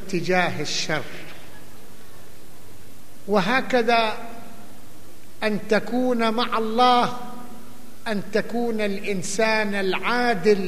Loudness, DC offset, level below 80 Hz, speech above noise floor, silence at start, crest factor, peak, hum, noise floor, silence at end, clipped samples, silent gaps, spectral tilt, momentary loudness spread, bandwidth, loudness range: -22 LUFS; 4%; -58 dBFS; 25 dB; 0 s; 20 dB; -4 dBFS; none; -47 dBFS; 0 s; under 0.1%; none; -4 dB/octave; 20 LU; 15 kHz; 4 LU